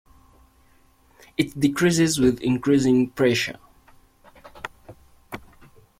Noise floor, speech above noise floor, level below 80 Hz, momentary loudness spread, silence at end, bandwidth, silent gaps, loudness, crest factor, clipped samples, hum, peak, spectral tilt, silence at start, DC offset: -57 dBFS; 37 dB; -52 dBFS; 21 LU; 0.6 s; 16 kHz; none; -21 LUFS; 18 dB; under 0.1%; none; -6 dBFS; -5 dB/octave; 1.4 s; under 0.1%